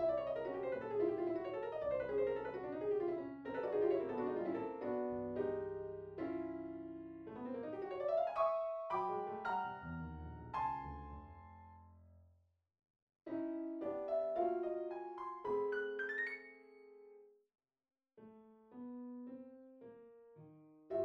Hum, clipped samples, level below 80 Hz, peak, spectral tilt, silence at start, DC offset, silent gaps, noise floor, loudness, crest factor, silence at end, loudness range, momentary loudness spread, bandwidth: none; under 0.1%; -66 dBFS; -24 dBFS; -8.5 dB/octave; 0 s; under 0.1%; 12.90-12.94 s, 13.02-13.07 s; -75 dBFS; -41 LUFS; 18 dB; 0 s; 11 LU; 21 LU; 5.8 kHz